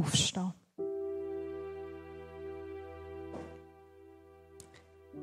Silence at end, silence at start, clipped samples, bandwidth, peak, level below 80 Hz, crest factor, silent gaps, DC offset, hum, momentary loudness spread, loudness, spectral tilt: 0 s; 0 s; under 0.1%; 15 kHz; -14 dBFS; -62 dBFS; 24 dB; none; under 0.1%; none; 23 LU; -39 LUFS; -3.5 dB/octave